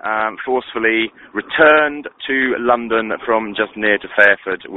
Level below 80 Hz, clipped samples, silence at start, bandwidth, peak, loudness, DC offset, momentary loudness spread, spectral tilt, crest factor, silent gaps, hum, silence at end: -54 dBFS; under 0.1%; 0.05 s; 5 kHz; 0 dBFS; -16 LUFS; under 0.1%; 10 LU; -6 dB/octave; 16 dB; none; none; 0 s